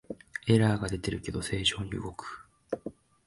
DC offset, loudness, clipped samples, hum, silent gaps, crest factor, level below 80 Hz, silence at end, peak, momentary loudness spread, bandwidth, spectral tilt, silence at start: under 0.1%; -30 LUFS; under 0.1%; none; none; 22 dB; -50 dBFS; 0.35 s; -10 dBFS; 18 LU; 11.5 kHz; -5 dB/octave; 0.1 s